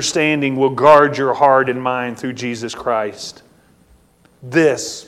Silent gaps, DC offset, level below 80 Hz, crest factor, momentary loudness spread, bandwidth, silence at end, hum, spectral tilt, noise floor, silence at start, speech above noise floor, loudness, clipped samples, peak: none; under 0.1%; -58 dBFS; 16 dB; 14 LU; 14 kHz; 0.05 s; none; -4.5 dB/octave; -52 dBFS; 0 s; 36 dB; -15 LUFS; under 0.1%; 0 dBFS